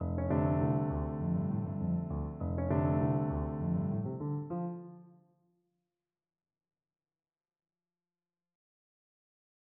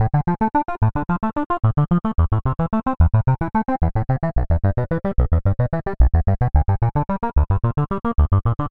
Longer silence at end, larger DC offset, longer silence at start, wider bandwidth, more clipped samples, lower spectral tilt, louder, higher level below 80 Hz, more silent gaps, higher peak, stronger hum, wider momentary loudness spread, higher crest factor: first, 4.65 s vs 0 s; neither; about the same, 0 s vs 0 s; second, 3.1 kHz vs 4 kHz; neither; about the same, -12 dB/octave vs -11.5 dB/octave; second, -34 LUFS vs -20 LUFS; second, -50 dBFS vs -24 dBFS; second, none vs 1.46-1.50 s; second, -18 dBFS vs -2 dBFS; neither; first, 8 LU vs 4 LU; about the same, 18 dB vs 16 dB